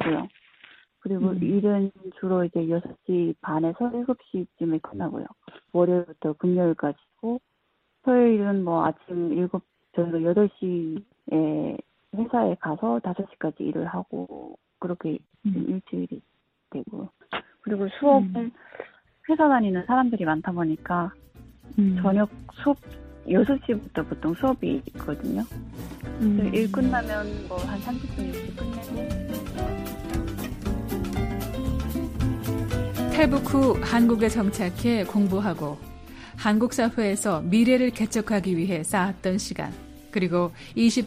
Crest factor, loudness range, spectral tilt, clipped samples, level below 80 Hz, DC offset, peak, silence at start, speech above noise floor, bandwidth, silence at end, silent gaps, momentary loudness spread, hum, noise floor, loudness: 20 dB; 7 LU; -6.5 dB/octave; under 0.1%; -42 dBFS; under 0.1%; -6 dBFS; 0 s; 47 dB; 15.5 kHz; 0 s; none; 14 LU; none; -72 dBFS; -26 LUFS